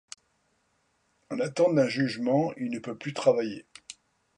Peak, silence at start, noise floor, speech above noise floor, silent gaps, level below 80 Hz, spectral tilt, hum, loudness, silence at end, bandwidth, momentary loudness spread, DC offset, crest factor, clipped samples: -10 dBFS; 1.3 s; -72 dBFS; 45 dB; none; -74 dBFS; -6 dB/octave; none; -27 LUFS; 0.45 s; 11 kHz; 22 LU; under 0.1%; 20 dB; under 0.1%